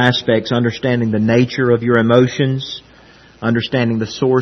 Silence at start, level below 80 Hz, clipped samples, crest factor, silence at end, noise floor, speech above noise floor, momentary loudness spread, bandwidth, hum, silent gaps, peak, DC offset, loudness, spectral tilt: 0 s; -52 dBFS; under 0.1%; 16 dB; 0 s; -44 dBFS; 30 dB; 7 LU; 6.4 kHz; none; none; 0 dBFS; under 0.1%; -16 LUFS; -6.5 dB/octave